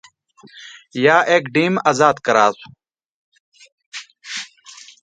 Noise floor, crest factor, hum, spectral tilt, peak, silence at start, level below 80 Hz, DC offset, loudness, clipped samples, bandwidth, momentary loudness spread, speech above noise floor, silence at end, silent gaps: -43 dBFS; 20 dB; none; -4.5 dB/octave; 0 dBFS; 0.55 s; -66 dBFS; under 0.1%; -16 LUFS; under 0.1%; 9.4 kHz; 24 LU; 26 dB; 0.55 s; 3.06-3.32 s, 3.40-3.52 s, 3.72-3.78 s, 3.86-3.92 s